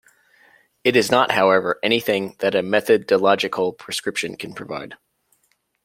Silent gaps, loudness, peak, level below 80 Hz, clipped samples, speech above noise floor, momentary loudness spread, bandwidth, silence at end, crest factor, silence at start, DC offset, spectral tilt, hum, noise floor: none; -19 LUFS; 0 dBFS; -64 dBFS; under 0.1%; 47 dB; 15 LU; 16.5 kHz; 0.9 s; 20 dB; 0.85 s; under 0.1%; -4 dB/octave; none; -67 dBFS